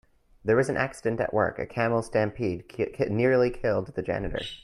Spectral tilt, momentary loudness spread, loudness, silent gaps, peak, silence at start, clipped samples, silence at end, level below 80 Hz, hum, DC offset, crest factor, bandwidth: -6.5 dB/octave; 8 LU; -27 LUFS; none; -10 dBFS; 0.45 s; under 0.1%; 0.05 s; -48 dBFS; none; under 0.1%; 18 dB; 12 kHz